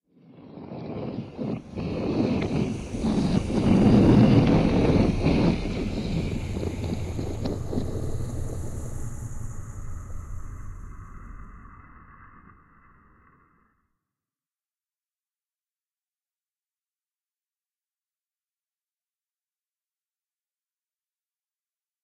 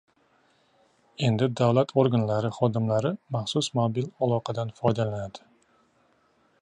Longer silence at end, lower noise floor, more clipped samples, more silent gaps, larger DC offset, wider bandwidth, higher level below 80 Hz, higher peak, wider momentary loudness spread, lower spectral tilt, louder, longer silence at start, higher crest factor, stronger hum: first, 9.65 s vs 1.25 s; first, under -90 dBFS vs -66 dBFS; neither; neither; neither; first, 12 kHz vs 10 kHz; first, -38 dBFS vs -62 dBFS; about the same, -6 dBFS vs -8 dBFS; first, 23 LU vs 8 LU; first, -8 dB/octave vs -6.5 dB/octave; about the same, -25 LUFS vs -26 LUFS; second, 0.3 s vs 1.2 s; about the same, 22 dB vs 20 dB; neither